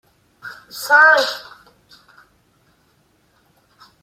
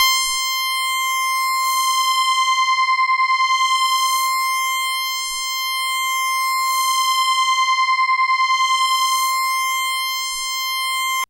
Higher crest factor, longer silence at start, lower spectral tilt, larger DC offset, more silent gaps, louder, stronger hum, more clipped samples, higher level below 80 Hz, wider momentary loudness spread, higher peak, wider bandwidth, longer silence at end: about the same, 20 dB vs 16 dB; first, 0.45 s vs 0 s; first, 0 dB/octave vs 7 dB/octave; neither; neither; first, -13 LUFS vs -17 LUFS; second, none vs 50 Hz at -75 dBFS; neither; second, -68 dBFS vs -60 dBFS; first, 27 LU vs 4 LU; about the same, 0 dBFS vs -2 dBFS; about the same, 16 kHz vs 16 kHz; first, 2.65 s vs 0.05 s